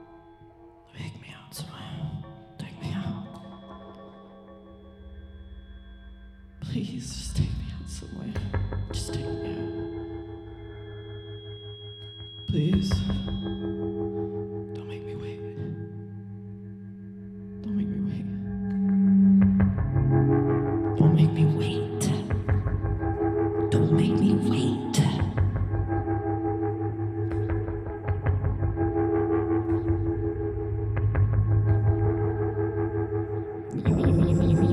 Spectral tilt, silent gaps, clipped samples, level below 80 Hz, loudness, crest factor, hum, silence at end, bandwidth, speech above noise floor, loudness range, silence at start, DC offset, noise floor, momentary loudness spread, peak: -7.5 dB/octave; none; under 0.1%; -40 dBFS; -26 LUFS; 20 dB; none; 0 s; 12.5 kHz; 24 dB; 15 LU; 0 s; under 0.1%; -51 dBFS; 19 LU; -6 dBFS